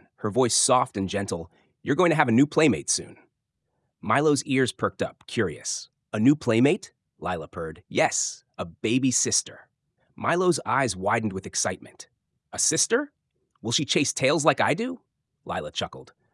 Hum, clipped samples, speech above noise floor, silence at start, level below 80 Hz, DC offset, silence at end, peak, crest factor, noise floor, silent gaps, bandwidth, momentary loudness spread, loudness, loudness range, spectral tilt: none; under 0.1%; 54 dB; 0.2 s; -66 dBFS; under 0.1%; 0.3 s; -4 dBFS; 22 dB; -78 dBFS; none; 12 kHz; 15 LU; -24 LUFS; 3 LU; -3.5 dB/octave